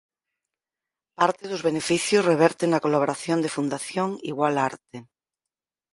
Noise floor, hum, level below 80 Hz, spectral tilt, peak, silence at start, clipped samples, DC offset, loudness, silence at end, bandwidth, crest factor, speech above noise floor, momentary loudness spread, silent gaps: -89 dBFS; none; -68 dBFS; -4.5 dB/octave; -4 dBFS; 1.2 s; under 0.1%; under 0.1%; -24 LUFS; 0.9 s; 11.5 kHz; 22 dB; 66 dB; 8 LU; none